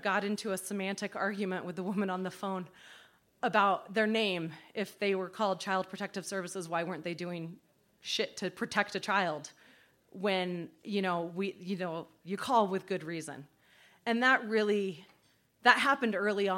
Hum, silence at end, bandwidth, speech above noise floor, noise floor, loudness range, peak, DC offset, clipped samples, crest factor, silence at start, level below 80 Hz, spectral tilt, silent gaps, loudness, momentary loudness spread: none; 0 s; 16.5 kHz; 36 dB; -69 dBFS; 5 LU; -8 dBFS; under 0.1%; under 0.1%; 26 dB; 0 s; -80 dBFS; -4.5 dB/octave; none; -32 LUFS; 13 LU